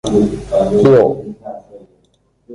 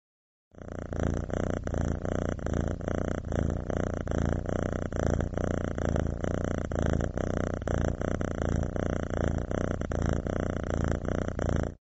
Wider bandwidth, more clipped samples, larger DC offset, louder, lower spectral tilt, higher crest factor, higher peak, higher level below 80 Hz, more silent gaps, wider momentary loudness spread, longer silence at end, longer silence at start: first, 11 kHz vs 8 kHz; neither; neither; first, -12 LUFS vs -31 LUFS; about the same, -7.5 dB/octave vs -7.5 dB/octave; second, 14 dB vs 20 dB; first, 0 dBFS vs -10 dBFS; about the same, -40 dBFS vs -38 dBFS; neither; first, 22 LU vs 2 LU; about the same, 0 s vs 0.1 s; second, 0.05 s vs 0.55 s